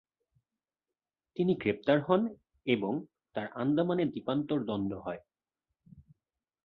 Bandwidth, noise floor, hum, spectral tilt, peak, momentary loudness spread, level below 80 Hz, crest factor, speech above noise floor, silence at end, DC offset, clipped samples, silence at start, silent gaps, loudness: 5 kHz; under -90 dBFS; none; -9.5 dB/octave; -10 dBFS; 12 LU; -68 dBFS; 22 dB; over 59 dB; 0.65 s; under 0.1%; under 0.1%; 1.35 s; none; -32 LUFS